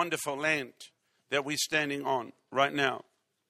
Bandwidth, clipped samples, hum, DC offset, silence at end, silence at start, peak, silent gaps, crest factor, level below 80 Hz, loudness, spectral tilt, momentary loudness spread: 16 kHz; under 0.1%; none; under 0.1%; 0.5 s; 0 s; -10 dBFS; none; 22 dB; -78 dBFS; -30 LUFS; -2.5 dB/octave; 7 LU